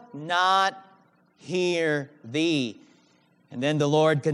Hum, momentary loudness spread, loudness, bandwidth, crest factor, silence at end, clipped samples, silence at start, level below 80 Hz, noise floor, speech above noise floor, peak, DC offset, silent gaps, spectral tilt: none; 10 LU; -25 LUFS; 12 kHz; 18 dB; 0 s; under 0.1%; 0.15 s; -82 dBFS; -62 dBFS; 38 dB; -8 dBFS; under 0.1%; none; -5 dB/octave